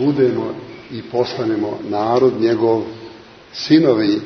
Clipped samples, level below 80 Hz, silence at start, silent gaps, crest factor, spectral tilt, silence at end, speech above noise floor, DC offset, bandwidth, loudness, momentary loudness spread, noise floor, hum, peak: under 0.1%; -58 dBFS; 0 s; none; 16 dB; -7 dB/octave; 0 s; 23 dB; under 0.1%; 6.4 kHz; -17 LUFS; 18 LU; -39 dBFS; none; 0 dBFS